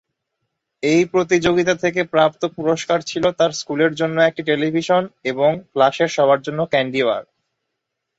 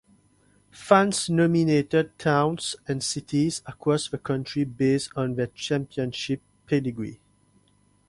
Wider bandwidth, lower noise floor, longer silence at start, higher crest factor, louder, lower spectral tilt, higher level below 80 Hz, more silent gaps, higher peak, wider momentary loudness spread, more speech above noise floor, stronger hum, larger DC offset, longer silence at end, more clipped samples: second, 8 kHz vs 11.5 kHz; first, -78 dBFS vs -63 dBFS; about the same, 0.85 s vs 0.75 s; second, 16 dB vs 22 dB; first, -18 LUFS vs -25 LUFS; about the same, -5 dB/octave vs -5.5 dB/octave; about the same, -56 dBFS vs -60 dBFS; neither; about the same, -2 dBFS vs -4 dBFS; second, 4 LU vs 10 LU; first, 60 dB vs 39 dB; second, none vs 50 Hz at -50 dBFS; neither; about the same, 0.95 s vs 0.95 s; neither